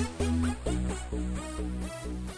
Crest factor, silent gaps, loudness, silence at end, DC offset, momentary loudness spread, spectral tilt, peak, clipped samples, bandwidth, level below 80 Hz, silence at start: 14 dB; none; -33 LUFS; 0 s; under 0.1%; 8 LU; -6 dB/octave; -16 dBFS; under 0.1%; 11 kHz; -36 dBFS; 0 s